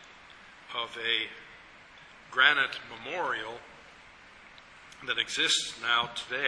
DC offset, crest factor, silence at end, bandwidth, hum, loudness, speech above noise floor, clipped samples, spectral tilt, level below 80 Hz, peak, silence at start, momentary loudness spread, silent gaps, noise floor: under 0.1%; 26 dB; 0 s; 11 kHz; none; -28 LUFS; 23 dB; under 0.1%; 0 dB/octave; -68 dBFS; -6 dBFS; 0 s; 27 LU; none; -53 dBFS